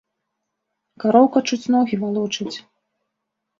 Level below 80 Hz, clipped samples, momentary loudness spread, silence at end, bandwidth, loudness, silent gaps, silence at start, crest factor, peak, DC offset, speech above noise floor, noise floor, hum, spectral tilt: -68 dBFS; under 0.1%; 13 LU; 1 s; 7.6 kHz; -19 LUFS; none; 1 s; 20 dB; -2 dBFS; under 0.1%; 61 dB; -79 dBFS; none; -5 dB/octave